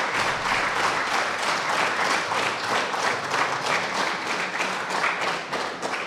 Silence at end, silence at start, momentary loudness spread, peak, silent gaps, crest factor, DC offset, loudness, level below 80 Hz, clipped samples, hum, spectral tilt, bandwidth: 0 s; 0 s; 4 LU; -8 dBFS; none; 18 dB; under 0.1%; -24 LUFS; -58 dBFS; under 0.1%; none; -2 dB/octave; 16 kHz